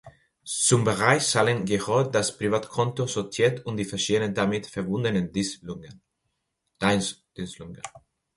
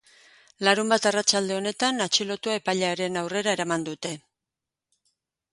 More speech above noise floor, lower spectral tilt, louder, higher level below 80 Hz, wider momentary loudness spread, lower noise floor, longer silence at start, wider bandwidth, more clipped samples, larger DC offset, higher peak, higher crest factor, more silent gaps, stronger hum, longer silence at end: second, 53 dB vs 63 dB; first, -4 dB/octave vs -2.5 dB/octave; about the same, -25 LUFS vs -25 LUFS; first, -56 dBFS vs -72 dBFS; first, 17 LU vs 8 LU; second, -78 dBFS vs -88 dBFS; second, 0.05 s vs 0.6 s; about the same, 11.5 kHz vs 11.5 kHz; neither; neither; about the same, -2 dBFS vs -4 dBFS; about the same, 24 dB vs 24 dB; neither; neither; second, 0.4 s vs 1.35 s